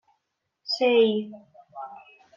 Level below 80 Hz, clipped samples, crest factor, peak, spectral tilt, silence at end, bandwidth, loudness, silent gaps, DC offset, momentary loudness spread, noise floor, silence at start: -82 dBFS; under 0.1%; 18 dB; -10 dBFS; -5 dB/octave; 0.4 s; 7.2 kHz; -23 LUFS; none; under 0.1%; 22 LU; -79 dBFS; 0.65 s